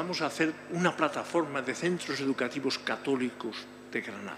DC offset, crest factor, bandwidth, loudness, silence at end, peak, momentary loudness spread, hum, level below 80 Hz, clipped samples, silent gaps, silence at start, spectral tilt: under 0.1%; 20 dB; 15 kHz; -31 LUFS; 0 s; -12 dBFS; 8 LU; 50 Hz at -60 dBFS; -76 dBFS; under 0.1%; none; 0 s; -4.5 dB/octave